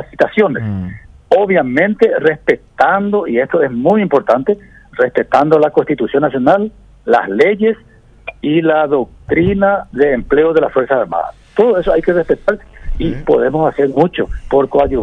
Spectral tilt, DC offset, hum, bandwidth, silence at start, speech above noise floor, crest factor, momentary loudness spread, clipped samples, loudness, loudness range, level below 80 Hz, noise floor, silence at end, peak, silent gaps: -8 dB/octave; under 0.1%; none; 7.4 kHz; 0 s; 20 dB; 14 dB; 9 LU; 0.2%; -13 LUFS; 1 LU; -34 dBFS; -33 dBFS; 0 s; 0 dBFS; none